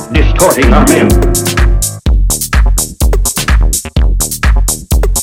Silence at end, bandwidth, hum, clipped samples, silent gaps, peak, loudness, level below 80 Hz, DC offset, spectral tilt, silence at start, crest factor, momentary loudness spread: 0 s; 17 kHz; none; 0.6%; none; 0 dBFS; -10 LUFS; -10 dBFS; under 0.1%; -4.5 dB/octave; 0 s; 8 dB; 6 LU